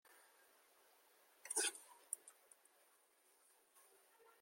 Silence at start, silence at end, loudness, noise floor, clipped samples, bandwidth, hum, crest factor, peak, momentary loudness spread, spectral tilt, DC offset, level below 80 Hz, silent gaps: 1.45 s; 2.1 s; -44 LUFS; -75 dBFS; under 0.1%; 16.5 kHz; none; 28 dB; -26 dBFS; 27 LU; 3 dB/octave; under 0.1%; under -90 dBFS; none